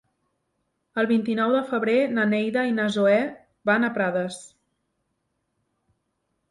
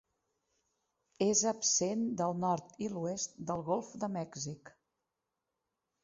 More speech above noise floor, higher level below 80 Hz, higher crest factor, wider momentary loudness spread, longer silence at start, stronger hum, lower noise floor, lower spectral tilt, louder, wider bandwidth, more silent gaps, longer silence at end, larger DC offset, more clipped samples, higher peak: about the same, 53 dB vs 53 dB; about the same, -70 dBFS vs -74 dBFS; about the same, 18 dB vs 18 dB; about the same, 10 LU vs 11 LU; second, 0.95 s vs 1.2 s; neither; second, -76 dBFS vs -88 dBFS; about the same, -6 dB/octave vs -5.5 dB/octave; first, -23 LUFS vs -34 LUFS; first, 11.5 kHz vs 7.6 kHz; neither; first, 2.05 s vs 1.35 s; neither; neither; first, -8 dBFS vs -18 dBFS